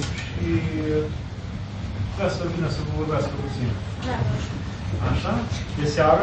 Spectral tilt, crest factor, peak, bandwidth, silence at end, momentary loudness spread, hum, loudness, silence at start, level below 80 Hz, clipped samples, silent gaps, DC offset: -6.5 dB/octave; 20 dB; -6 dBFS; 8.6 kHz; 0 s; 7 LU; none; -26 LUFS; 0 s; -36 dBFS; under 0.1%; none; under 0.1%